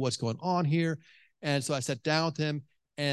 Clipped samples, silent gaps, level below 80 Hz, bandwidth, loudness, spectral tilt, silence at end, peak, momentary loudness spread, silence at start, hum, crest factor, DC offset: under 0.1%; none; -72 dBFS; 12.5 kHz; -31 LUFS; -5 dB/octave; 0 s; -12 dBFS; 11 LU; 0 s; none; 20 dB; under 0.1%